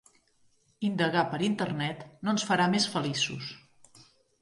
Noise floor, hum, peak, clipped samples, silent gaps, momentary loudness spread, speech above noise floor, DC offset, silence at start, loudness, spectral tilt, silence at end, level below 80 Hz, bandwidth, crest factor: -67 dBFS; none; -12 dBFS; under 0.1%; none; 10 LU; 38 dB; under 0.1%; 0.8 s; -29 LUFS; -4.5 dB/octave; 0.4 s; -70 dBFS; 11.5 kHz; 20 dB